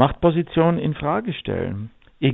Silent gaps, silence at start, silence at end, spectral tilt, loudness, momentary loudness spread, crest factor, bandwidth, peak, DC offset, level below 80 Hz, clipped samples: none; 0 s; 0 s; -11 dB/octave; -22 LUFS; 11 LU; 20 dB; 4 kHz; 0 dBFS; under 0.1%; -42 dBFS; under 0.1%